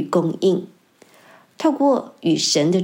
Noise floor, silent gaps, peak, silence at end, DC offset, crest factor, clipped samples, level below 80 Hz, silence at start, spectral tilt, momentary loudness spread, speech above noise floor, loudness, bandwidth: -52 dBFS; none; -6 dBFS; 0 s; under 0.1%; 14 dB; under 0.1%; -74 dBFS; 0 s; -5 dB/octave; 5 LU; 34 dB; -19 LUFS; 16.5 kHz